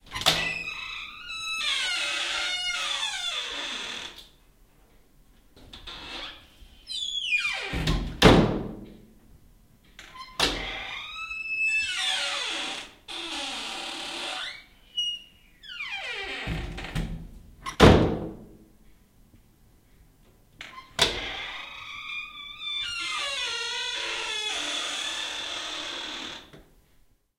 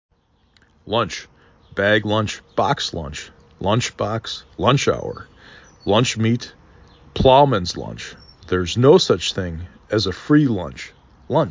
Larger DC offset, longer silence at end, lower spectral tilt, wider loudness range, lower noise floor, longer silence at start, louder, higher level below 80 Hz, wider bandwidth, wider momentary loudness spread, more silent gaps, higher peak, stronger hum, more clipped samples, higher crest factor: neither; first, 0.75 s vs 0 s; second, -3.5 dB/octave vs -5.5 dB/octave; first, 8 LU vs 4 LU; about the same, -61 dBFS vs -59 dBFS; second, 0.05 s vs 0.85 s; second, -27 LUFS vs -19 LUFS; about the same, -42 dBFS vs -40 dBFS; first, 16 kHz vs 7.6 kHz; about the same, 17 LU vs 19 LU; neither; about the same, -2 dBFS vs -2 dBFS; neither; neither; first, 28 dB vs 20 dB